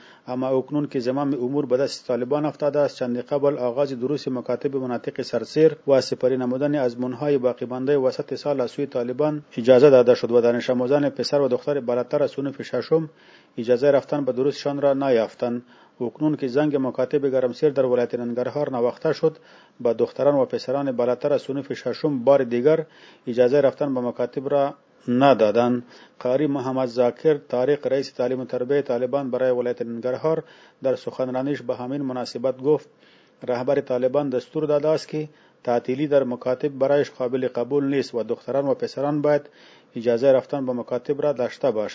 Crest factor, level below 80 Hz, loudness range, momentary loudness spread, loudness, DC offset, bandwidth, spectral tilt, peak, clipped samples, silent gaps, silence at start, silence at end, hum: 20 dB; -72 dBFS; 5 LU; 9 LU; -23 LUFS; under 0.1%; 8 kHz; -7 dB/octave; -2 dBFS; under 0.1%; none; 0.25 s; 0 s; none